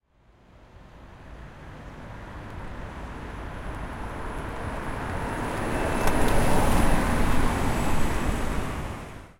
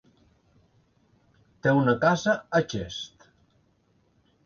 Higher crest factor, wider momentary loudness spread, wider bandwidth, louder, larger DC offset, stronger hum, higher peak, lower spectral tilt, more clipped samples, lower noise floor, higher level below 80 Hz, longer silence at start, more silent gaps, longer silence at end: about the same, 18 dB vs 20 dB; first, 20 LU vs 14 LU; first, 16.5 kHz vs 7.2 kHz; second, -29 LUFS vs -25 LUFS; neither; neither; about the same, -8 dBFS vs -10 dBFS; about the same, -5.5 dB/octave vs -6 dB/octave; neither; second, -58 dBFS vs -67 dBFS; first, -32 dBFS vs -58 dBFS; second, 0.75 s vs 1.65 s; neither; second, 0.1 s vs 1.4 s